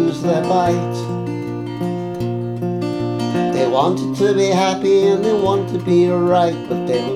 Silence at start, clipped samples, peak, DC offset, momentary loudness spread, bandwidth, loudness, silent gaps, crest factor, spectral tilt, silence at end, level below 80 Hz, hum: 0 s; under 0.1%; -4 dBFS; under 0.1%; 9 LU; 13.5 kHz; -18 LUFS; none; 14 dB; -6.5 dB/octave; 0 s; -52 dBFS; none